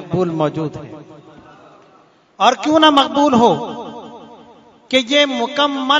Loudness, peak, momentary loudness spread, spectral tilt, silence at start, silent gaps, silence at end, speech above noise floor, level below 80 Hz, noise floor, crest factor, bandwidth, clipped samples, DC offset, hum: -15 LUFS; 0 dBFS; 21 LU; -4.5 dB/octave; 0 s; none; 0 s; 36 dB; -58 dBFS; -51 dBFS; 18 dB; 12 kHz; under 0.1%; under 0.1%; none